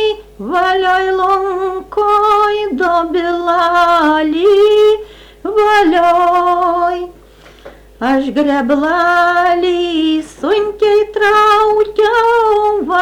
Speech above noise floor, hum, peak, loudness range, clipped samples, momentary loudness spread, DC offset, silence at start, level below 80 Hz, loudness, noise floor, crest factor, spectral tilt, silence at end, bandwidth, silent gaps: 29 dB; none; -4 dBFS; 3 LU; under 0.1%; 8 LU; under 0.1%; 0 s; -44 dBFS; -12 LUFS; -40 dBFS; 8 dB; -4 dB/octave; 0 s; 14 kHz; none